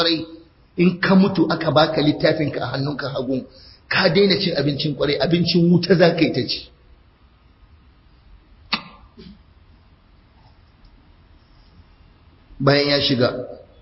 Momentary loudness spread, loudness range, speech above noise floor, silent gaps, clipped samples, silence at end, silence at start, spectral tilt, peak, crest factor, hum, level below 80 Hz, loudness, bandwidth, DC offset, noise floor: 11 LU; 17 LU; 35 dB; none; under 0.1%; 0.2 s; 0 s; -9.5 dB/octave; -4 dBFS; 18 dB; none; -50 dBFS; -19 LUFS; 5.8 kHz; under 0.1%; -53 dBFS